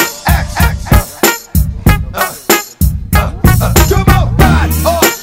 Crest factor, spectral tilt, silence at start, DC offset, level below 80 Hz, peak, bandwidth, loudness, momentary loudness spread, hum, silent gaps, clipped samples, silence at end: 10 dB; -4.5 dB/octave; 0 s; under 0.1%; -16 dBFS; 0 dBFS; 16.5 kHz; -11 LUFS; 6 LU; none; none; 0.6%; 0 s